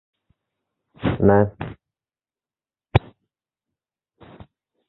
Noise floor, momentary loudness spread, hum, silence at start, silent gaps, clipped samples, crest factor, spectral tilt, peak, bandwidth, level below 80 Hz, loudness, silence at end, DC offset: under -90 dBFS; 16 LU; none; 1 s; none; under 0.1%; 24 dB; -10.5 dB/octave; -2 dBFS; 4.2 kHz; -42 dBFS; -21 LUFS; 1.9 s; under 0.1%